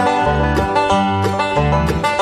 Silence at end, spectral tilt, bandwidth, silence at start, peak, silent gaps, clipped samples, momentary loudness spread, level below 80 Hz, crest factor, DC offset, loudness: 0 s; -6 dB/octave; 13.5 kHz; 0 s; -4 dBFS; none; under 0.1%; 2 LU; -26 dBFS; 12 dB; under 0.1%; -16 LUFS